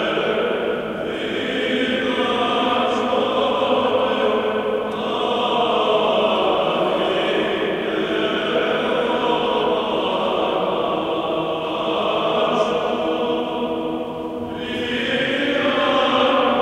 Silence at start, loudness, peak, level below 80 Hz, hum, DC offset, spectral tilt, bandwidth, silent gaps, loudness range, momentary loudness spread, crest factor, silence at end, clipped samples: 0 s; -20 LUFS; -4 dBFS; -52 dBFS; none; under 0.1%; -5 dB/octave; 13.5 kHz; none; 2 LU; 6 LU; 14 dB; 0 s; under 0.1%